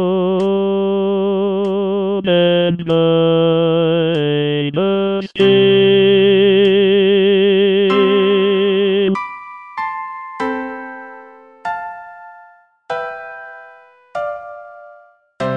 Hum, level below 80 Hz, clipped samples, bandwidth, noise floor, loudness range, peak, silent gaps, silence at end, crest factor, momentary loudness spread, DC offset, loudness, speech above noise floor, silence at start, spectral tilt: none; -62 dBFS; under 0.1%; 5.6 kHz; -46 dBFS; 17 LU; -2 dBFS; none; 0 s; 14 dB; 19 LU; under 0.1%; -14 LUFS; 33 dB; 0 s; -8 dB/octave